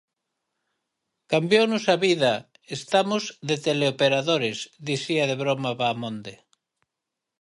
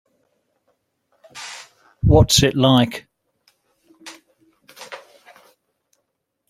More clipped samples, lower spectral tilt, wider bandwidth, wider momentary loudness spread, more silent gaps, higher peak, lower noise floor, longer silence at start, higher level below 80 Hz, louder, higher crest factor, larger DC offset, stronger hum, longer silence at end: neither; about the same, -4.5 dB/octave vs -5 dB/octave; second, 11.5 kHz vs 16 kHz; second, 13 LU vs 27 LU; neither; second, -6 dBFS vs -2 dBFS; first, -85 dBFS vs -74 dBFS; about the same, 1.3 s vs 1.35 s; second, -72 dBFS vs -36 dBFS; second, -23 LUFS vs -15 LUFS; about the same, 20 dB vs 20 dB; neither; neither; second, 1.05 s vs 1.5 s